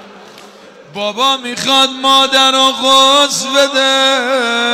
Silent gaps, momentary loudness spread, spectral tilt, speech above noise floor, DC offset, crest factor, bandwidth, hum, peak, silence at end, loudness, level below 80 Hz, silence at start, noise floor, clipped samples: none; 7 LU; -0.5 dB/octave; 26 dB; under 0.1%; 10 dB; 16 kHz; none; -2 dBFS; 0 s; -10 LUFS; -60 dBFS; 0 s; -37 dBFS; under 0.1%